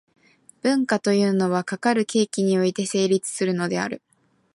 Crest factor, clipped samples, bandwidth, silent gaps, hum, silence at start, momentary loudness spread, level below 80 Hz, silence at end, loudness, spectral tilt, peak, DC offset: 14 dB; under 0.1%; 11.5 kHz; none; none; 0.65 s; 6 LU; -70 dBFS; 0.6 s; -22 LUFS; -5 dB/octave; -8 dBFS; under 0.1%